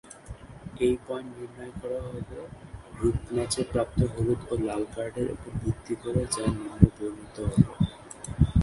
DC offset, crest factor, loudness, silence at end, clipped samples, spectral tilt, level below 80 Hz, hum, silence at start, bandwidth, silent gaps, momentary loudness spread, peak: under 0.1%; 28 dB; -29 LUFS; 0 s; under 0.1%; -6.5 dB/octave; -38 dBFS; none; 0.05 s; 11.5 kHz; none; 18 LU; 0 dBFS